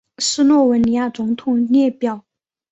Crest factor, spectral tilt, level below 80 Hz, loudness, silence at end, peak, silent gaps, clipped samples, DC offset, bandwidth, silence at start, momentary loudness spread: 12 dB; -4 dB/octave; -54 dBFS; -17 LUFS; 0.55 s; -4 dBFS; none; under 0.1%; under 0.1%; 8.2 kHz; 0.2 s; 10 LU